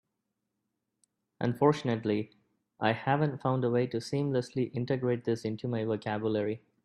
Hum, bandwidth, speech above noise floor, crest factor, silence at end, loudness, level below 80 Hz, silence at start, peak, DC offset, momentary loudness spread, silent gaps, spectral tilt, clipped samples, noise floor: none; 12 kHz; 54 dB; 20 dB; 0.25 s; -31 LUFS; -70 dBFS; 1.4 s; -10 dBFS; under 0.1%; 7 LU; none; -7.5 dB/octave; under 0.1%; -84 dBFS